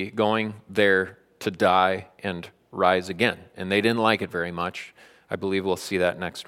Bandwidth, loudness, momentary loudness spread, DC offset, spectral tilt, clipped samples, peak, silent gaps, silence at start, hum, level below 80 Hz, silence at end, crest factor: 16 kHz; -24 LUFS; 13 LU; under 0.1%; -5 dB/octave; under 0.1%; -4 dBFS; none; 0 s; none; -64 dBFS; 0.05 s; 22 dB